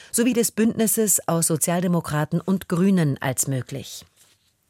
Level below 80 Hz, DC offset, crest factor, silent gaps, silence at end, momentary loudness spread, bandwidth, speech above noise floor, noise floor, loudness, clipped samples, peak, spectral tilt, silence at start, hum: -58 dBFS; under 0.1%; 16 dB; none; 0.65 s; 10 LU; 16.5 kHz; 38 dB; -60 dBFS; -21 LUFS; under 0.1%; -6 dBFS; -5 dB/octave; 0.15 s; none